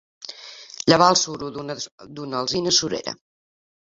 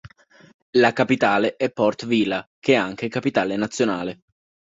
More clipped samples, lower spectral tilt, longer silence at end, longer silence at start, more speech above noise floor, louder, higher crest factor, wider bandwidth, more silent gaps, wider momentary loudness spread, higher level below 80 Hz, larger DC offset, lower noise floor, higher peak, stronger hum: neither; second, -3 dB/octave vs -5 dB/octave; about the same, 0.65 s vs 0.55 s; first, 0.2 s vs 0.05 s; second, 20 dB vs 27 dB; about the same, -20 LUFS vs -21 LUFS; about the same, 22 dB vs 20 dB; about the same, 7.8 kHz vs 8 kHz; second, 1.92-1.98 s vs 0.54-0.73 s, 2.47-2.62 s; first, 22 LU vs 7 LU; about the same, -60 dBFS vs -60 dBFS; neither; second, -41 dBFS vs -47 dBFS; about the same, 0 dBFS vs -2 dBFS; neither